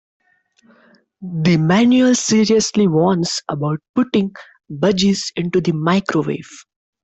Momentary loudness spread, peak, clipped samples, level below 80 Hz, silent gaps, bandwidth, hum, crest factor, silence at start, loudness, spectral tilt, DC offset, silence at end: 11 LU; -4 dBFS; under 0.1%; -54 dBFS; 3.89-3.94 s; 8.4 kHz; none; 14 dB; 1.2 s; -16 LUFS; -5 dB/octave; under 0.1%; 0.4 s